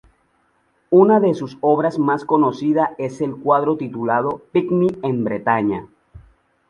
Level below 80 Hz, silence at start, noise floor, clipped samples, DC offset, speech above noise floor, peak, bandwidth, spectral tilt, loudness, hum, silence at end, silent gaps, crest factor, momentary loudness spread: -56 dBFS; 0.9 s; -63 dBFS; under 0.1%; under 0.1%; 45 dB; -2 dBFS; 8.8 kHz; -8.5 dB/octave; -18 LUFS; none; 0.5 s; none; 16 dB; 9 LU